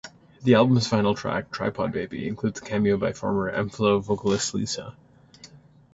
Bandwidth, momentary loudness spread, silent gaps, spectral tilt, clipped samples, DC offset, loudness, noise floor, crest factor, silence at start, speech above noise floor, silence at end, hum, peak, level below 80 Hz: 8 kHz; 10 LU; none; -5.5 dB/octave; under 0.1%; under 0.1%; -24 LUFS; -51 dBFS; 20 dB; 0.05 s; 27 dB; 0.4 s; none; -4 dBFS; -54 dBFS